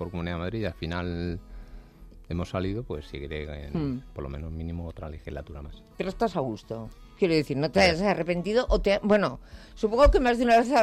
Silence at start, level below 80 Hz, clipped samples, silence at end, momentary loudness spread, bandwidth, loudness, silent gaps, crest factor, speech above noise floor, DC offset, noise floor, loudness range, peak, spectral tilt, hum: 0 s; -38 dBFS; under 0.1%; 0 s; 18 LU; 13 kHz; -27 LUFS; none; 16 dB; 22 dB; under 0.1%; -48 dBFS; 11 LU; -10 dBFS; -6 dB/octave; none